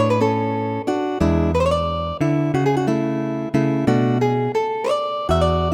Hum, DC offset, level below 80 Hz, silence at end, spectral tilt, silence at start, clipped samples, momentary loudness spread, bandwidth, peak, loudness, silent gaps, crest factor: none; under 0.1%; -34 dBFS; 0 s; -7.5 dB/octave; 0 s; under 0.1%; 5 LU; 14.5 kHz; -4 dBFS; -20 LUFS; none; 16 dB